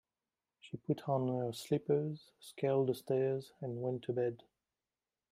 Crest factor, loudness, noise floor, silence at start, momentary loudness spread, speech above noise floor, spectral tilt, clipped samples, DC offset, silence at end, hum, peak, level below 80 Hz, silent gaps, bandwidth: 16 dB; -37 LUFS; under -90 dBFS; 0.65 s; 14 LU; over 54 dB; -7.5 dB/octave; under 0.1%; under 0.1%; 0.95 s; none; -20 dBFS; -78 dBFS; none; 16 kHz